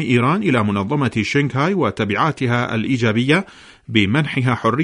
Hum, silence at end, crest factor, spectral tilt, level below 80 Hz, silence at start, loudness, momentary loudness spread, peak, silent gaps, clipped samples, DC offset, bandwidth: none; 0 s; 18 dB; -6.5 dB/octave; -52 dBFS; 0 s; -18 LUFS; 3 LU; 0 dBFS; none; under 0.1%; under 0.1%; 11 kHz